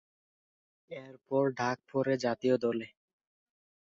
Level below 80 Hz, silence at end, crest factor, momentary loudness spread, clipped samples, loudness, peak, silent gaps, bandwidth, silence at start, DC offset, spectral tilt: -76 dBFS; 1.1 s; 20 dB; 17 LU; under 0.1%; -32 LUFS; -16 dBFS; none; 7.8 kHz; 0.9 s; under 0.1%; -6.5 dB/octave